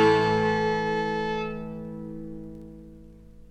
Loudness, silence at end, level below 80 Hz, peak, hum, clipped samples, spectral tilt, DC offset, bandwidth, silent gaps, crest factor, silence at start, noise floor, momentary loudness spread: -27 LUFS; 0.05 s; -50 dBFS; -8 dBFS; 50 Hz at -50 dBFS; under 0.1%; -6.5 dB/octave; under 0.1%; 9.6 kHz; none; 18 dB; 0 s; -47 dBFS; 22 LU